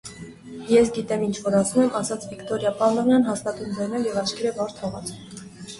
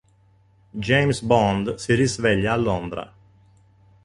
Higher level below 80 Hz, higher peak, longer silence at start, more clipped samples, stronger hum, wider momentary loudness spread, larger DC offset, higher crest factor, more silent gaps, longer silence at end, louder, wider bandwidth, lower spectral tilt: second, -56 dBFS vs -46 dBFS; about the same, -6 dBFS vs -4 dBFS; second, 0.05 s vs 0.75 s; neither; neither; first, 20 LU vs 14 LU; neither; about the same, 18 dB vs 20 dB; neither; second, 0 s vs 1 s; about the same, -23 LUFS vs -21 LUFS; about the same, 11.5 kHz vs 11.5 kHz; about the same, -5 dB/octave vs -5.5 dB/octave